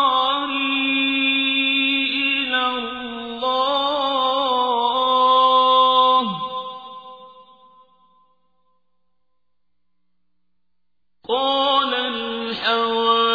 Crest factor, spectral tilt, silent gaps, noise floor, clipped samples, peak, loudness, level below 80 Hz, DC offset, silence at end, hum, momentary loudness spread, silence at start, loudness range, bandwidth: 16 dB; -4.5 dB/octave; none; -81 dBFS; under 0.1%; -6 dBFS; -18 LUFS; -62 dBFS; under 0.1%; 0 s; 60 Hz at -75 dBFS; 13 LU; 0 s; 9 LU; 5 kHz